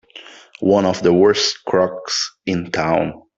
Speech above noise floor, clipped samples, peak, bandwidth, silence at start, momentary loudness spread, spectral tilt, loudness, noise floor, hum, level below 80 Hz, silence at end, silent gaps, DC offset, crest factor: 24 dB; under 0.1%; -2 dBFS; 7.8 kHz; 0.15 s; 9 LU; -4.5 dB/octave; -17 LUFS; -41 dBFS; none; -54 dBFS; 0.2 s; none; under 0.1%; 16 dB